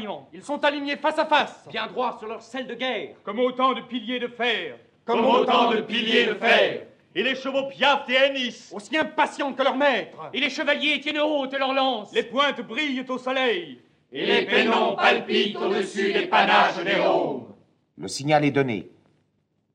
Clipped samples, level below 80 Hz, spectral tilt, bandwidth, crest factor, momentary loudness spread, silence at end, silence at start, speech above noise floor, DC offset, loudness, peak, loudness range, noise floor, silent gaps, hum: under 0.1%; -74 dBFS; -4 dB/octave; 10.5 kHz; 18 dB; 13 LU; 0.85 s; 0 s; 47 dB; under 0.1%; -23 LUFS; -4 dBFS; 5 LU; -70 dBFS; none; none